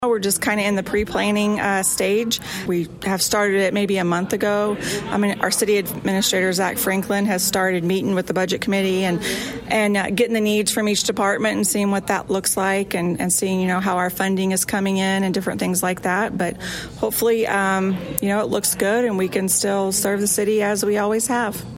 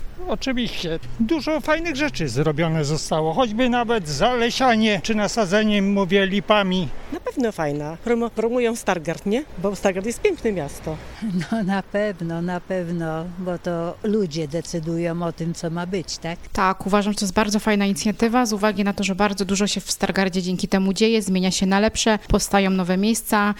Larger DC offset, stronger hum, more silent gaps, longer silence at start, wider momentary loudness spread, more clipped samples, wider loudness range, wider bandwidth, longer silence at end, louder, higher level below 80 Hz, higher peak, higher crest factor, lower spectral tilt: neither; neither; neither; about the same, 0 s vs 0 s; second, 4 LU vs 8 LU; neither; second, 1 LU vs 6 LU; about the same, 16.5 kHz vs 17 kHz; about the same, 0 s vs 0 s; about the same, -20 LUFS vs -22 LUFS; second, -50 dBFS vs -40 dBFS; about the same, 0 dBFS vs -2 dBFS; about the same, 20 dB vs 18 dB; second, -3.5 dB/octave vs -5 dB/octave